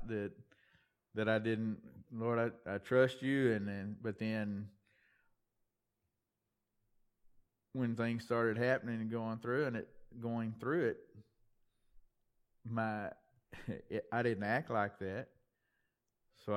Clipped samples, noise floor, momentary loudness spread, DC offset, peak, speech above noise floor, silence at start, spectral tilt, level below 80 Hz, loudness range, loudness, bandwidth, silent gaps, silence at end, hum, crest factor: under 0.1%; -88 dBFS; 14 LU; under 0.1%; -18 dBFS; 51 dB; 0 s; -7.5 dB/octave; -72 dBFS; 9 LU; -38 LUFS; 12 kHz; none; 0 s; none; 22 dB